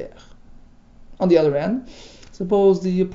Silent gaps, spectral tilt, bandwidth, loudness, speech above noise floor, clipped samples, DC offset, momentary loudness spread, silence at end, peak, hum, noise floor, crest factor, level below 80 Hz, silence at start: none; -8 dB/octave; 7.6 kHz; -19 LUFS; 26 dB; under 0.1%; under 0.1%; 13 LU; 0 s; -4 dBFS; none; -45 dBFS; 18 dB; -46 dBFS; 0 s